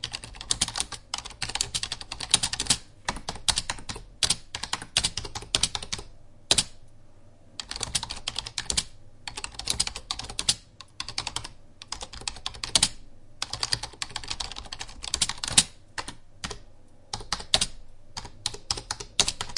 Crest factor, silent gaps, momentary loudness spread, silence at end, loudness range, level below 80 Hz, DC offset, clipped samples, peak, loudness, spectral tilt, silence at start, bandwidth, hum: 30 dB; none; 15 LU; 0 s; 4 LU; -46 dBFS; under 0.1%; under 0.1%; 0 dBFS; -28 LUFS; -0.5 dB/octave; 0 s; 11.5 kHz; none